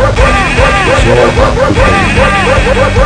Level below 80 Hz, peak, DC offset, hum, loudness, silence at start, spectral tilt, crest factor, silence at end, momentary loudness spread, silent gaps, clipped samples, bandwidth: -14 dBFS; 0 dBFS; under 0.1%; none; -7 LUFS; 0 s; -5.5 dB/octave; 6 dB; 0 s; 1 LU; none; 2%; 10.5 kHz